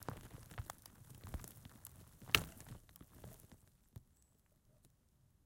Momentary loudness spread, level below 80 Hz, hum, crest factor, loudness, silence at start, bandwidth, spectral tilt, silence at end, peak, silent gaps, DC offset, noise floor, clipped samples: 26 LU; -60 dBFS; none; 42 dB; -42 LUFS; 0 s; 17 kHz; -2.5 dB/octave; 0.6 s; -8 dBFS; none; under 0.1%; -73 dBFS; under 0.1%